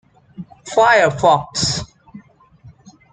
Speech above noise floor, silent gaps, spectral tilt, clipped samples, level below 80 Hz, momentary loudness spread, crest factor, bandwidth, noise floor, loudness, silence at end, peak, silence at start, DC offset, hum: 32 dB; none; -3.5 dB/octave; under 0.1%; -48 dBFS; 24 LU; 18 dB; 9.6 kHz; -46 dBFS; -15 LUFS; 0.45 s; -2 dBFS; 0.4 s; under 0.1%; none